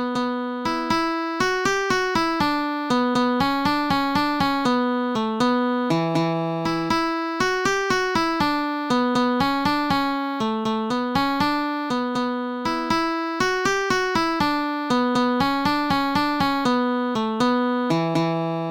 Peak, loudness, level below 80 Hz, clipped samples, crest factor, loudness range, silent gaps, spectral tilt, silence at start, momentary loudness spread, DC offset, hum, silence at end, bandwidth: -8 dBFS; -22 LUFS; -50 dBFS; under 0.1%; 14 dB; 1 LU; none; -5 dB/octave; 0 s; 4 LU; under 0.1%; none; 0 s; 18 kHz